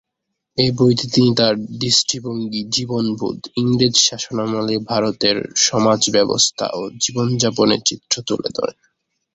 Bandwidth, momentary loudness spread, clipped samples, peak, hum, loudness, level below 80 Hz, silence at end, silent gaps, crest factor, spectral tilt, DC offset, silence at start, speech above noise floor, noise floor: 8.2 kHz; 9 LU; under 0.1%; -2 dBFS; none; -17 LUFS; -54 dBFS; 0.65 s; none; 18 dB; -3.5 dB/octave; under 0.1%; 0.55 s; 60 dB; -78 dBFS